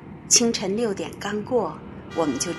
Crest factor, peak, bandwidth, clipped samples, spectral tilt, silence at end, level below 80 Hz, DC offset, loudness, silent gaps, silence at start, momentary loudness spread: 20 dB; -4 dBFS; 13 kHz; under 0.1%; -2.5 dB/octave; 0 s; -54 dBFS; under 0.1%; -23 LUFS; none; 0 s; 14 LU